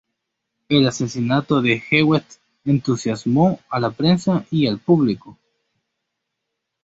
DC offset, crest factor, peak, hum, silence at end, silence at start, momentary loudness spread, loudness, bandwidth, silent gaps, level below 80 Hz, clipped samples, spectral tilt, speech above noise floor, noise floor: under 0.1%; 18 dB; -2 dBFS; none; 1.5 s; 0.7 s; 6 LU; -19 LUFS; 8 kHz; none; -56 dBFS; under 0.1%; -6 dB/octave; 61 dB; -79 dBFS